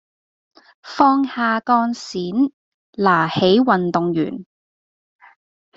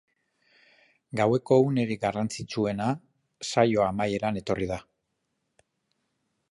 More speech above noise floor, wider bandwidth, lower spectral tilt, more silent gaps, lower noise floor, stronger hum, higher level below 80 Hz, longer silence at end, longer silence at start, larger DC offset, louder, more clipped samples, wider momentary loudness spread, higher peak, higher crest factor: first, over 73 dB vs 53 dB; second, 7.8 kHz vs 11.5 kHz; about the same, -6 dB/octave vs -6 dB/octave; first, 2.53-2.93 s vs none; first, under -90 dBFS vs -79 dBFS; neither; about the same, -60 dBFS vs -58 dBFS; second, 1.35 s vs 1.7 s; second, 0.85 s vs 1.15 s; neither; first, -18 LUFS vs -27 LUFS; neither; about the same, 11 LU vs 12 LU; first, -2 dBFS vs -6 dBFS; about the same, 18 dB vs 22 dB